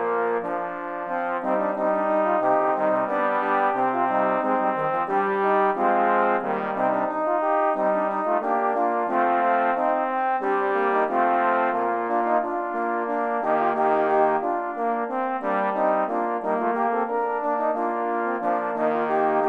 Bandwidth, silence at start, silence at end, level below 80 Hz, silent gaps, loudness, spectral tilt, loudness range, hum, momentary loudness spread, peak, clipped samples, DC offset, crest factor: 5.6 kHz; 0 s; 0 s; -72 dBFS; none; -23 LUFS; -7.5 dB/octave; 2 LU; none; 5 LU; -8 dBFS; under 0.1%; under 0.1%; 16 dB